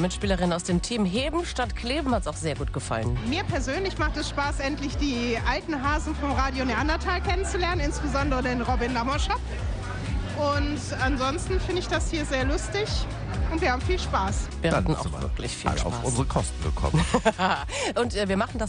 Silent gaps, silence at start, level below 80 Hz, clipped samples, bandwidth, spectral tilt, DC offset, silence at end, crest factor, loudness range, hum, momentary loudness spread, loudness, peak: none; 0 s; -32 dBFS; under 0.1%; 10 kHz; -5 dB/octave; under 0.1%; 0 s; 18 dB; 2 LU; none; 4 LU; -27 LUFS; -8 dBFS